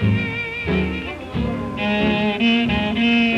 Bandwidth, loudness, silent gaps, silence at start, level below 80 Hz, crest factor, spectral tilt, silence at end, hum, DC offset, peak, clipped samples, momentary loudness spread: 8 kHz; -20 LUFS; none; 0 s; -36 dBFS; 14 dB; -7 dB/octave; 0 s; none; under 0.1%; -6 dBFS; under 0.1%; 8 LU